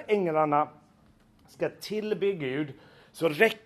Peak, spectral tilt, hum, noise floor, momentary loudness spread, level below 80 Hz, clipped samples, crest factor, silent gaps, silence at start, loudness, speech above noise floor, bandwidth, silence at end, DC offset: -6 dBFS; -5.5 dB/octave; none; -60 dBFS; 10 LU; -70 dBFS; under 0.1%; 22 dB; none; 0 s; -29 LUFS; 33 dB; 13.5 kHz; 0.05 s; under 0.1%